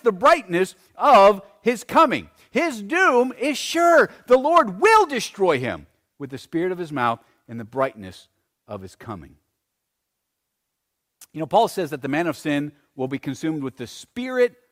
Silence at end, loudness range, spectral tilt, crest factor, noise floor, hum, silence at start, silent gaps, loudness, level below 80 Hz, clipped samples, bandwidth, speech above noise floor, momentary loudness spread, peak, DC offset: 0.25 s; 14 LU; -4.5 dB/octave; 16 dB; -79 dBFS; none; 0.05 s; none; -20 LUFS; -60 dBFS; under 0.1%; 16 kHz; 59 dB; 21 LU; -6 dBFS; under 0.1%